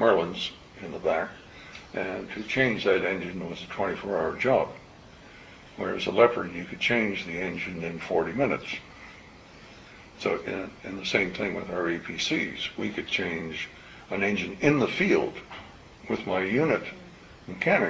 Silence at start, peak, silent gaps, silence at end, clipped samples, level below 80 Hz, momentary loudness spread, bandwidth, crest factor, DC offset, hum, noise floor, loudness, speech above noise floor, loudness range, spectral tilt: 0 s; -6 dBFS; none; 0 s; under 0.1%; -56 dBFS; 22 LU; 8 kHz; 22 dB; under 0.1%; none; -49 dBFS; -28 LUFS; 22 dB; 5 LU; -5 dB/octave